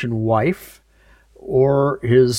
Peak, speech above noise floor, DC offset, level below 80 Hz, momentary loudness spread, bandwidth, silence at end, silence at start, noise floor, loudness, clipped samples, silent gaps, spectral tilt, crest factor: -2 dBFS; 35 dB; under 0.1%; -48 dBFS; 12 LU; 15.5 kHz; 0 s; 0 s; -53 dBFS; -18 LUFS; under 0.1%; none; -7 dB/octave; 16 dB